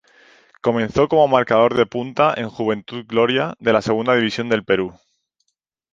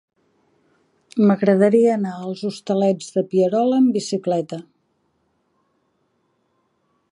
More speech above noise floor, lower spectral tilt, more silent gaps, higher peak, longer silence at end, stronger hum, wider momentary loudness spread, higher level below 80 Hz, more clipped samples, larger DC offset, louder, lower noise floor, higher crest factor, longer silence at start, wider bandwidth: first, 57 dB vs 49 dB; about the same, -6 dB/octave vs -7 dB/octave; neither; first, 0 dBFS vs -4 dBFS; second, 1 s vs 2.5 s; neither; second, 8 LU vs 12 LU; first, -54 dBFS vs -72 dBFS; neither; neither; about the same, -18 LUFS vs -19 LUFS; first, -74 dBFS vs -68 dBFS; about the same, 18 dB vs 18 dB; second, 0.65 s vs 1.15 s; second, 7.6 kHz vs 11 kHz